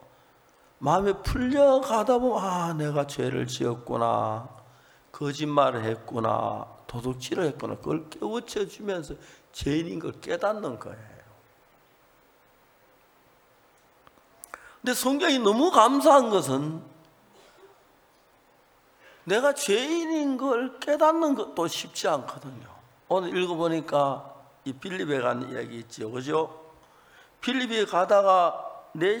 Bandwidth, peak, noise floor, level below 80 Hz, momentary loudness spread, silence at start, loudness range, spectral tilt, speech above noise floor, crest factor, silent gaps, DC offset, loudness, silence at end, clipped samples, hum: over 20 kHz; -4 dBFS; -61 dBFS; -52 dBFS; 17 LU; 0.8 s; 10 LU; -5 dB/octave; 35 dB; 24 dB; none; under 0.1%; -26 LUFS; 0 s; under 0.1%; none